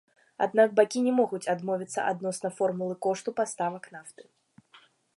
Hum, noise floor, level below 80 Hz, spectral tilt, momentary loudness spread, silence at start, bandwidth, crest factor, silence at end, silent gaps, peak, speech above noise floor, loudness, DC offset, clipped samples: none; -60 dBFS; -82 dBFS; -5 dB/octave; 10 LU; 0.4 s; 11.5 kHz; 20 dB; 1.05 s; none; -8 dBFS; 32 dB; -28 LUFS; under 0.1%; under 0.1%